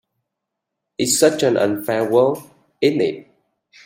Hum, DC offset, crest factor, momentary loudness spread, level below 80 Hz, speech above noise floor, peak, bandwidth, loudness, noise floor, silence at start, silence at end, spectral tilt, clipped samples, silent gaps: none; under 0.1%; 18 dB; 13 LU; -64 dBFS; 63 dB; -2 dBFS; 16.5 kHz; -18 LUFS; -80 dBFS; 1 s; 0.65 s; -4 dB/octave; under 0.1%; none